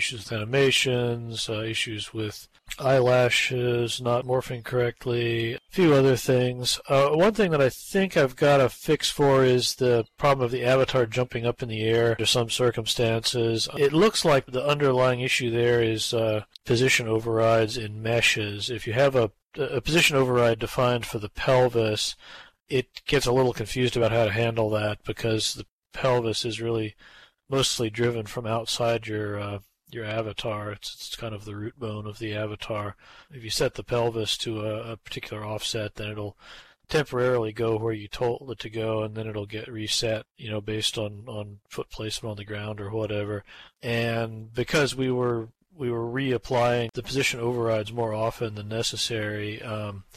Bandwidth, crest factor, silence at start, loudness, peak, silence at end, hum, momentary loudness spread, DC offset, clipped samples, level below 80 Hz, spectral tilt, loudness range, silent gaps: 15 kHz; 16 dB; 0 s; -25 LUFS; -8 dBFS; 0.15 s; none; 13 LU; under 0.1%; under 0.1%; -52 dBFS; -4.5 dB/octave; 8 LU; 25.71-25.83 s